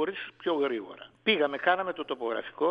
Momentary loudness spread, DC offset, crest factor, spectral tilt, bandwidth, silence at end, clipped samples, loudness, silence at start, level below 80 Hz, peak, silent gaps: 9 LU; under 0.1%; 20 dB; -6.5 dB/octave; 5.2 kHz; 0 s; under 0.1%; -29 LUFS; 0 s; -76 dBFS; -10 dBFS; none